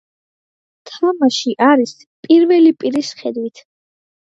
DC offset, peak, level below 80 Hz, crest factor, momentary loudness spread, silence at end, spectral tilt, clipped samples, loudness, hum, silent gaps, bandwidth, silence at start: under 0.1%; 0 dBFS; -70 dBFS; 16 dB; 13 LU; 0.85 s; -4 dB/octave; under 0.1%; -14 LUFS; none; 2.06-2.23 s; 7.8 kHz; 0.85 s